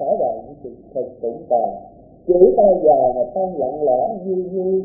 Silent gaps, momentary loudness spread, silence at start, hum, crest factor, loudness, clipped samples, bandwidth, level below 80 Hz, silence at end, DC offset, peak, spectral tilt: none; 18 LU; 0 s; none; 18 dB; -18 LUFS; under 0.1%; 0.9 kHz; -50 dBFS; 0 s; under 0.1%; 0 dBFS; -17.5 dB/octave